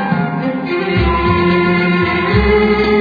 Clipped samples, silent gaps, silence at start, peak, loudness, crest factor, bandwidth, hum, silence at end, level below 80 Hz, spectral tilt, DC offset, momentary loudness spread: under 0.1%; none; 0 s; -2 dBFS; -14 LUFS; 12 dB; 5 kHz; none; 0 s; -26 dBFS; -9 dB/octave; under 0.1%; 6 LU